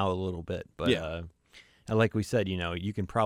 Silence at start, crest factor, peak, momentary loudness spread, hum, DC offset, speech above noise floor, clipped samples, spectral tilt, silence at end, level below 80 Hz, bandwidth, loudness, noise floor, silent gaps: 0 s; 20 dB; -10 dBFS; 12 LU; none; under 0.1%; 28 dB; under 0.1%; -6.5 dB/octave; 0 s; -52 dBFS; 15.5 kHz; -31 LUFS; -58 dBFS; none